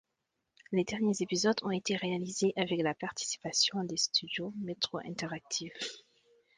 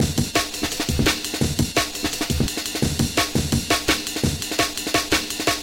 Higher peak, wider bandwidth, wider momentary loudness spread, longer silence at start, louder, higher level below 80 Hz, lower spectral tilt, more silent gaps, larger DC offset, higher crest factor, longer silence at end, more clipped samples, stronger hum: second, -14 dBFS vs -4 dBFS; second, 11 kHz vs 17 kHz; first, 10 LU vs 4 LU; first, 0.7 s vs 0 s; second, -33 LUFS vs -22 LUFS; second, -72 dBFS vs -36 dBFS; about the same, -3.5 dB/octave vs -3.5 dB/octave; neither; neither; about the same, 20 dB vs 18 dB; first, 0.55 s vs 0 s; neither; neither